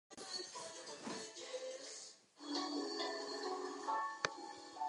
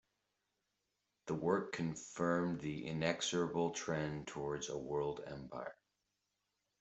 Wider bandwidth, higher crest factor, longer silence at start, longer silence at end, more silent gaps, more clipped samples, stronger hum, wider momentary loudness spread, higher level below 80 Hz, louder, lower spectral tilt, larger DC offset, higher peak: first, 11 kHz vs 8.2 kHz; first, 28 dB vs 22 dB; second, 0.1 s vs 1.25 s; second, 0 s vs 1.1 s; neither; neither; neither; about the same, 10 LU vs 11 LU; second, -88 dBFS vs -70 dBFS; second, -44 LUFS vs -40 LUFS; second, -1.5 dB/octave vs -5 dB/octave; neither; about the same, -18 dBFS vs -18 dBFS